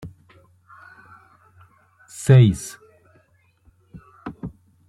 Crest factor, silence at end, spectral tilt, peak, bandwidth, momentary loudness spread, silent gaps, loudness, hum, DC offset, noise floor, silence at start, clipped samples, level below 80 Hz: 20 dB; 0.4 s; -7 dB/octave; -4 dBFS; 12.5 kHz; 26 LU; none; -17 LUFS; none; under 0.1%; -60 dBFS; 0.05 s; under 0.1%; -52 dBFS